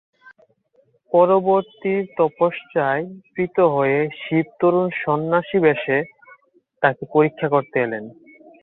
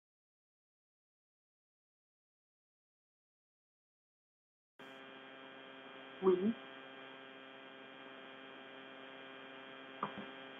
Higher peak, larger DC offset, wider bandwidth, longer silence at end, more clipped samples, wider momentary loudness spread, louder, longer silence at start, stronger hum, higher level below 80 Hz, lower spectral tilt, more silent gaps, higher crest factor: first, -2 dBFS vs -20 dBFS; neither; about the same, 4.1 kHz vs 3.9 kHz; first, 0.5 s vs 0 s; neither; second, 7 LU vs 18 LU; first, -20 LUFS vs -44 LUFS; second, 1.1 s vs 4.8 s; neither; first, -64 dBFS vs -90 dBFS; first, -10.5 dB/octave vs -4 dB/octave; neither; second, 18 dB vs 26 dB